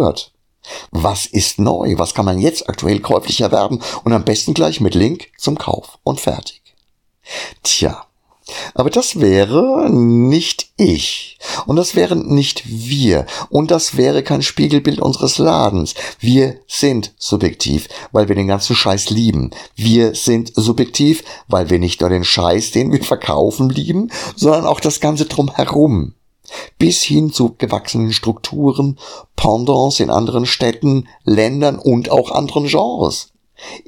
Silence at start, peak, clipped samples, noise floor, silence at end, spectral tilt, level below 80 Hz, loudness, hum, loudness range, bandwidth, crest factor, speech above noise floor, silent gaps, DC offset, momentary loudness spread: 0 s; 0 dBFS; under 0.1%; -60 dBFS; 0.1 s; -5 dB/octave; -38 dBFS; -15 LUFS; none; 3 LU; 17.5 kHz; 14 dB; 45 dB; none; under 0.1%; 8 LU